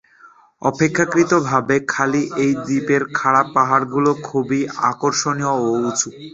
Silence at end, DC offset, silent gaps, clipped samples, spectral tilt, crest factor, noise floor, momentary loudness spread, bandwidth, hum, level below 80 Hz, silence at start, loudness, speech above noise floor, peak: 0.05 s; under 0.1%; none; under 0.1%; -4.5 dB/octave; 18 dB; -48 dBFS; 5 LU; 8 kHz; none; -58 dBFS; 0.25 s; -18 LUFS; 31 dB; 0 dBFS